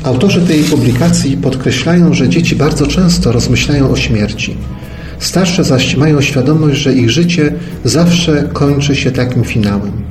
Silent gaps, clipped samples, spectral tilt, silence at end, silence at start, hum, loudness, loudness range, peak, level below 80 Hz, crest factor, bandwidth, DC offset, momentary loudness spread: none; under 0.1%; -5.5 dB/octave; 0 s; 0 s; none; -11 LUFS; 2 LU; 0 dBFS; -26 dBFS; 10 dB; 13.5 kHz; 0.5%; 6 LU